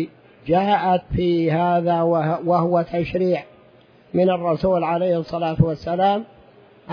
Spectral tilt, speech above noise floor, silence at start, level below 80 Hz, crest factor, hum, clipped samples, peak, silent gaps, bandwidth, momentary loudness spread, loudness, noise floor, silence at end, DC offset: -9.5 dB/octave; 32 dB; 0 s; -44 dBFS; 18 dB; none; under 0.1%; -2 dBFS; none; 5.4 kHz; 6 LU; -20 LUFS; -51 dBFS; 0 s; under 0.1%